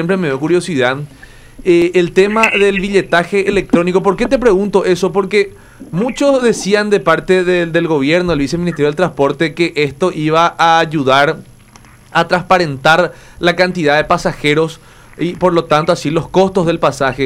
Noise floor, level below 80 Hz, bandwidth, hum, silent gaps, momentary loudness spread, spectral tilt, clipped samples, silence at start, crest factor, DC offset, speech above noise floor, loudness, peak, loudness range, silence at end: -41 dBFS; -38 dBFS; 14.5 kHz; none; none; 5 LU; -5.5 dB/octave; under 0.1%; 0 s; 14 dB; under 0.1%; 28 dB; -13 LUFS; 0 dBFS; 2 LU; 0 s